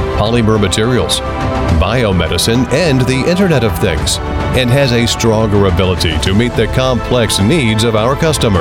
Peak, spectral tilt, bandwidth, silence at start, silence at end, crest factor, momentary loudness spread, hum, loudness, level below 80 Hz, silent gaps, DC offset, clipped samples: 0 dBFS; -5 dB/octave; 17 kHz; 0 s; 0 s; 10 dB; 3 LU; none; -12 LUFS; -24 dBFS; none; 0.2%; under 0.1%